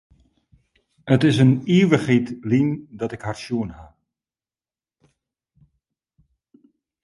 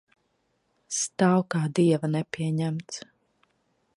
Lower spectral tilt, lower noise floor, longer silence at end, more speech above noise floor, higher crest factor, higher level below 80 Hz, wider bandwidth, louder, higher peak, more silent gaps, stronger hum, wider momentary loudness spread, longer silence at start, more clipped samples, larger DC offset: first, -7.5 dB/octave vs -5.5 dB/octave; first, under -90 dBFS vs -73 dBFS; first, 3.2 s vs 0.95 s; first, over 71 dB vs 47 dB; about the same, 22 dB vs 20 dB; first, -56 dBFS vs -70 dBFS; about the same, 11.5 kHz vs 11.5 kHz; first, -20 LUFS vs -26 LUFS; first, -2 dBFS vs -8 dBFS; neither; neither; first, 14 LU vs 11 LU; first, 1.05 s vs 0.9 s; neither; neither